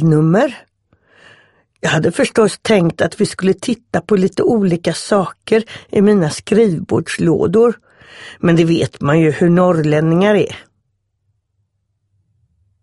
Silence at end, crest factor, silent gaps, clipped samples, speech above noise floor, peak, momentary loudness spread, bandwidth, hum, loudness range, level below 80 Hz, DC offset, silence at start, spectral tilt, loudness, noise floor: 2.2 s; 14 dB; none; under 0.1%; 54 dB; -2 dBFS; 7 LU; 11.5 kHz; none; 3 LU; -50 dBFS; under 0.1%; 0 s; -6.5 dB/octave; -14 LUFS; -67 dBFS